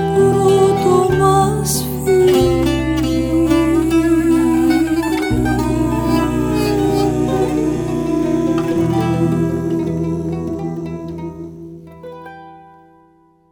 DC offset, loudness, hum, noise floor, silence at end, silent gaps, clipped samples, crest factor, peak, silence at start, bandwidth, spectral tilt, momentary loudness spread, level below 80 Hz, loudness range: under 0.1%; -16 LUFS; none; -52 dBFS; 0.9 s; none; under 0.1%; 14 dB; -2 dBFS; 0 s; over 20 kHz; -6.5 dB/octave; 15 LU; -32 dBFS; 9 LU